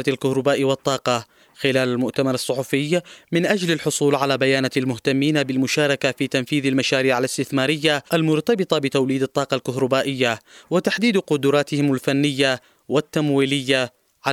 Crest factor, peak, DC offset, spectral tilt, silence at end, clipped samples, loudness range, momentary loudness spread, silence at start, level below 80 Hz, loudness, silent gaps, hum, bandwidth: 18 dB; -2 dBFS; under 0.1%; -5 dB/octave; 0 s; under 0.1%; 2 LU; 5 LU; 0 s; -64 dBFS; -20 LUFS; none; none; 16 kHz